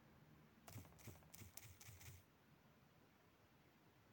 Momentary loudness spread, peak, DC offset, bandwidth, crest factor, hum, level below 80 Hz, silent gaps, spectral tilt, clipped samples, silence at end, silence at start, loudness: 10 LU; -32 dBFS; under 0.1%; 17 kHz; 34 dB; none; -82 dBFS; none; -4 dB/octave; under 0.1%; 0 s; 0 s; -62 LUFS